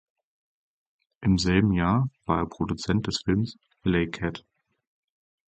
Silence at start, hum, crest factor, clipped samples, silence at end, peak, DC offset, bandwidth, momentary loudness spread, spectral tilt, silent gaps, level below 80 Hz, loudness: 1.2 s; none; 20 dB; under 0.1%; 1.1 s; -8 dBFS; under 0.1%; 9 kHz; 10 LU; -6 dB/octave; none; -44 dBFS; -26 LUFS